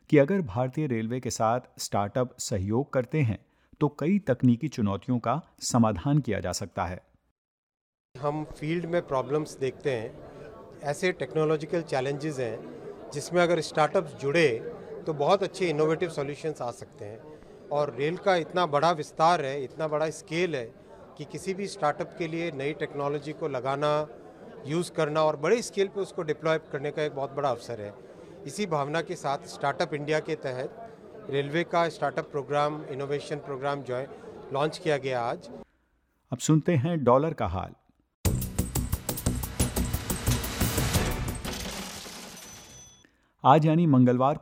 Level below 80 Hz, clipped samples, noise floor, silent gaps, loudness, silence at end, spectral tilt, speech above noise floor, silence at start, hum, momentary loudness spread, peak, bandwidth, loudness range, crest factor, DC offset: -46 dBFS; under 0.1%; -71 dBFS; 7.31-7.70 s, 7.81-7.93 s, 8.00-8.09 s, 38.14-38.24 s; -28 LUFS; 0 s; -5.5 dB/octave; 43 dB; 0.1 s; none; 15 LU; -4 dBFS; 16 kHz; 5 LU; 24 dB; under 0.1%